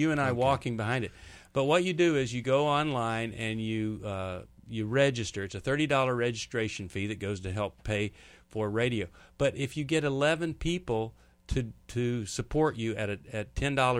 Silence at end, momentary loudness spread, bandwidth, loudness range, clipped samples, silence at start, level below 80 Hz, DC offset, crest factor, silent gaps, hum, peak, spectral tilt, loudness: 0 s; 10 LU; 14 kHz; 4 LU; under 0.1%; 0 s; -50 dBFS; under 0.1%; 18 dB; none; none; -12 dBFS; -5.5 dB/octave; -30 LUFS